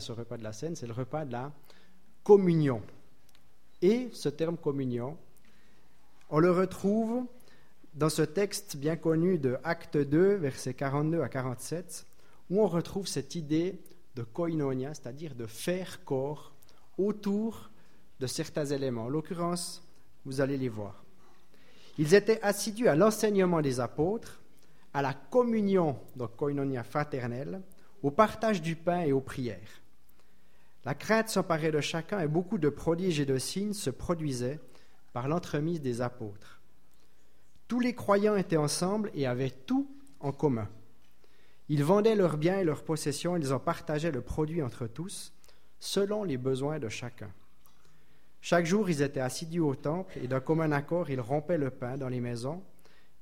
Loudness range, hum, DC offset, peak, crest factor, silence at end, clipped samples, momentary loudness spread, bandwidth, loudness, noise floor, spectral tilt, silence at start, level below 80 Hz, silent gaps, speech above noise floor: 6 LU; none; 0.5%; -10 dBFS; 22 dB; 0.6 s; under 0.1%; 14 LU; 16.5 kHz; -31 LUFS; -68 dBFS; -6 dB/octave; 0 s; -60 dBFS; none; 38 dB